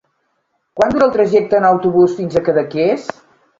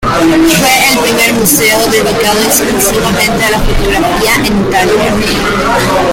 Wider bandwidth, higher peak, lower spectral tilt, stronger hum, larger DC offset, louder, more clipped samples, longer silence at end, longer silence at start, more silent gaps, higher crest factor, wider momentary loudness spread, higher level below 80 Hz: second, 7.6 kHz vs over 20 kHz; about the same, 0 dBFS vs 0 dBFS; first, -7 dB/octave vs -3 dB/octave; neither; neither; second, -14 LUFS vs -8 LUFS; second, under 0.1% vs 0.1%; first, 0.5 s vs 0 s; first, 0.75 s vs 0 s; neither; first, 14 dB vs 8 dB; first, 7 LU vs 4 LU; second, -50 dBFS vs -22 dBFS